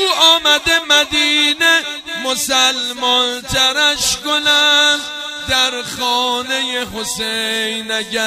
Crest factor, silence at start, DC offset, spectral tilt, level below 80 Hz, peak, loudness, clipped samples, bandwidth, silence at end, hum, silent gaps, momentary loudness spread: 16 dB; 0 s; under 0.1%; -0.5 dB/octave; -44 dBFS; 0 dBFS; -13 LUFS; under 0.1%; 15.5 kHz; 0 s; none; none; 10 LU